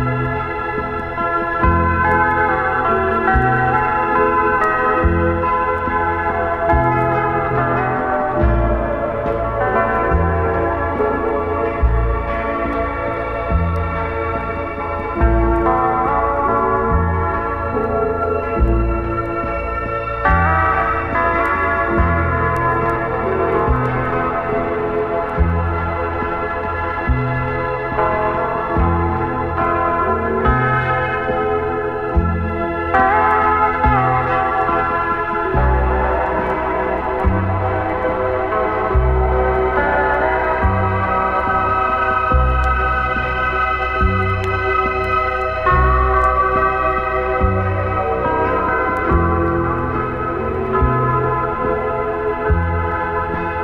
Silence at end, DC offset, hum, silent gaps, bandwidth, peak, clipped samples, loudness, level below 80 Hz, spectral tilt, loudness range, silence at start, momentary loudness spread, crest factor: 0 s; under 0.1%; none; none; 5.6 kHz; 0 dBFS; under 0.1%; -17 LUFS; -26 dBFS; -9 dB/octave; 3 LU; 0 s; 6 LU; 16 dB